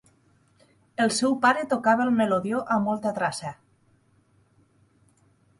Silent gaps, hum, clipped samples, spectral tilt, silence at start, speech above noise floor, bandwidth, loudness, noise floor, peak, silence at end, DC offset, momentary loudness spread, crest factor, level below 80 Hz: none; none; under 0.1%; -4.5 dB/octave; 1 s; 40 dB; 11.5 kHz; -24 LUFS; -63 dBFS; -8 dBFS; 2.05 s; under 0.1%; 9 LU; 20 dB; -68 dBFS